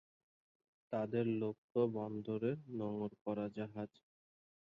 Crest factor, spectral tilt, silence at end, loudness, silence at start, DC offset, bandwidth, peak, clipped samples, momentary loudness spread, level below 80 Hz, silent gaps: 18 dB; -8 dB/octave; 0.8 s; -41 LUFS; 0.9 s; under 0.1%; 5.6 kHz; -22 dBFS; under 0.1%; 8 LU; -78 dBFS; 1.58-1.69 s, 3.21-3.25 s